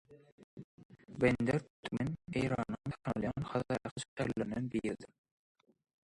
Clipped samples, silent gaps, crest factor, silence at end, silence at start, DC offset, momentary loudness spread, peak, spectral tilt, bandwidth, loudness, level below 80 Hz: under 0.1%; 0.32-0.38 s, 0.44-0.57 s, 0.64-0.78 s, 0.85-0.89 s, 1.70-1.83 s, 3.91-3.96 s, 4.08-4.17 s; 22 dB; 0.95 s; 0.1 s; under 0.1%; 17 LU; -16 dBFS; -6.5 dB/octave; 11.5 kHz; -37 LUFS; -60 dBFS